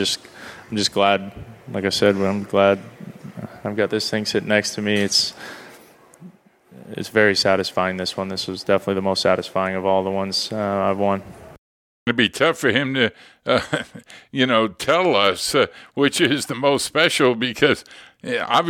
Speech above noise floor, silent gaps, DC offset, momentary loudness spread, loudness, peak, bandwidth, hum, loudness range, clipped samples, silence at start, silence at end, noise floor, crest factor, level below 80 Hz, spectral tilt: 29 dB; 11.58-12.06 s; under 0.1%; 14 LU; -20 LUFS; -2 dBFS; 17.5 kHz; none; 4 LU; under 0.1%; 0 s; 0 s; -49 dBFS; 20 dB; -58 dBFS; -4 dB/octave